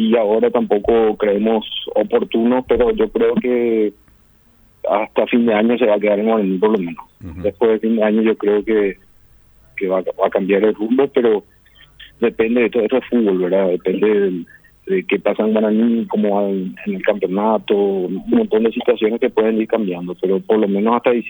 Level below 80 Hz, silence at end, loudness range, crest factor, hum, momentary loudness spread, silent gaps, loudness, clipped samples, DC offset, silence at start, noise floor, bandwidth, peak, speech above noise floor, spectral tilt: -48 dBFS; 0 s; 2 LU; 16 dB; none; 6 LU; none; -17 LUFS; under 0.1%; under 0.1%; 0 s; -52 dBFS; over 20 kHz; 0 dBFS; 36 dB; -9 dB/octave